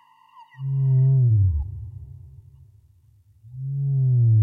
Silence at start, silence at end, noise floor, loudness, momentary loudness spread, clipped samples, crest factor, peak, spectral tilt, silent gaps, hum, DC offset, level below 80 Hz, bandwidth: 0.6 s; 0 s; -56 dBFS; -21 LUFS; 22 LU; under 0.1%; 10 dB; -12 dBFS; -13 dB/octave; none; none; under 0.1%; -38 dBFS; 2 kHz